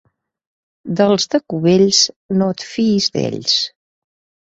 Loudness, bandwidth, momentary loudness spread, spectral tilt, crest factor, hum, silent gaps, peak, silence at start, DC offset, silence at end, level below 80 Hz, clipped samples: -16 LUFS; 8 kHz; 8 LU; -4 dB/octave; 18 dB; none; 2.16-2.29 s; 0 dBFS; 0.85 s; under 0.1%; 0.8 s; -58 dBFS; under 0.1%